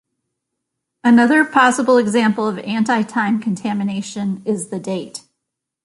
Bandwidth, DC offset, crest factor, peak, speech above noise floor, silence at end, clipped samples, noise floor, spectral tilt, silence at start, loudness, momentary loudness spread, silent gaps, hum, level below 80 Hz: 11.5 kHz; under 0.1%; 16 dB; -2 dBFS; 63 dB; 0.65 s; under 0.1%; -79 dBFS; -5 dB/octave; 1.05 s; -17 LUFS; 12 LU; none; none; -64 dBFS